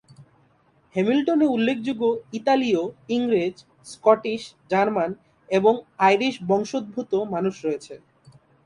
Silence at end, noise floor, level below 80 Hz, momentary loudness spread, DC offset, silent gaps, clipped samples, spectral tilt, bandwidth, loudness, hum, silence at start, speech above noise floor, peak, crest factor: 0.7 s; -61 dBFS; -66 dBFS; 10 LU; under 0.1%; none; under 0.1%; -6 dB/octave; 11 kHz; -23 LUFS; none; 0.2 s; 39 dB; -2 dBFS; 20 dB